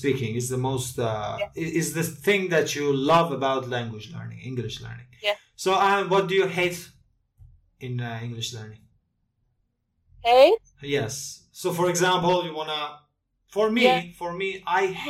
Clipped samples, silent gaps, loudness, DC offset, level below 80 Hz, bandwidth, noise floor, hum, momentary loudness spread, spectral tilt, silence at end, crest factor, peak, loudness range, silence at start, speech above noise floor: under 0.1%; none; -24 LUFS; under 0.1%; -58 dBFS; 16 kHz; -73 dBFS; none; 14 LU; -4.5 dB/octave; 0 s; 20 dB; -4 dBFS; 6 LU; 0 s; 49 dB